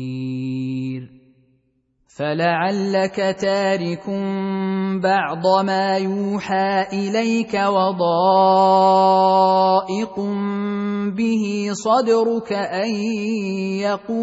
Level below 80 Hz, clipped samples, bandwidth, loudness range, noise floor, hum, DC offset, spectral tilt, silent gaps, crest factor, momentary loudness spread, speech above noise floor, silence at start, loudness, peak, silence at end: -64 dBFS; under 0.1%; 8 kHz; 6 LU; -65 dBFS; none; under 0.1%; -6 dB/octave; none; 16 dB; 11 LU; 47 dB; 0 s; -19 LUFS; -4 dBFS; 0 s